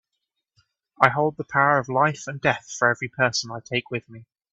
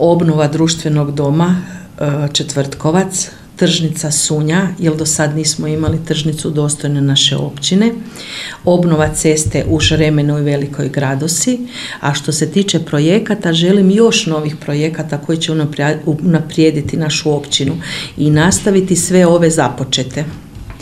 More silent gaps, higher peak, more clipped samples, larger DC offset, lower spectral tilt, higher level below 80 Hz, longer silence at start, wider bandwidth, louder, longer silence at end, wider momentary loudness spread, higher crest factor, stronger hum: neither; about the same, 0 dBFS vs 0 dBFS; neither; second, under 0.1% vs 0.2%; about the same, -4 dB/octave vs -4.5 dB/octave; second, -64 dBFS vs -38 dBFS; first, 1 s vs 0 s; second, 8.4 kHz vs 14.5 kHz; second, -23 LUFS vs -14 LUFS; first, 0.3 s vs 0 s; about the same, 8 LU vs 8 LU; first, 24 dB vs 14 dB; neither